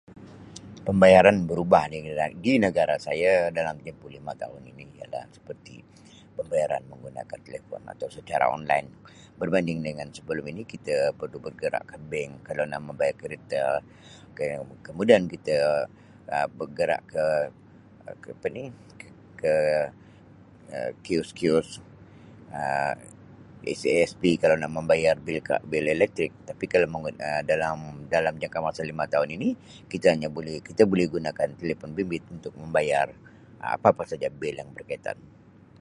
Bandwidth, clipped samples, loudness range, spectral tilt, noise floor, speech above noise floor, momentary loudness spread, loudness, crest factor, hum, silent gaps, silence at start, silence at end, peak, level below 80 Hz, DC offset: 11.5 kHz; under 0.1%; 6 LU; -6 dB/octave; -51 dBFS; 25 dB; 18 LU; -26 LUFS; 26 dB; none; none; 0.1 s; 0.65 s; -2 dBFS; -56 dBFS; under 0.1%